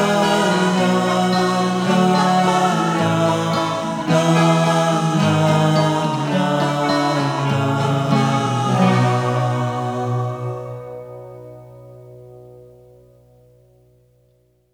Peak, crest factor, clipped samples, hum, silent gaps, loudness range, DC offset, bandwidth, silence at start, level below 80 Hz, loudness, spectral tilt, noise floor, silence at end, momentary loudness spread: -2 dBFS; 16 dB; under 0.1%; 60 Hz at -45 dBFS; none; 11 LU; under 0.1%; 16 kHz; 0 s; -58 dBFS; -17 LUFS; -6 dB/octave; -59 dBFS; 2.15 s; 9 LU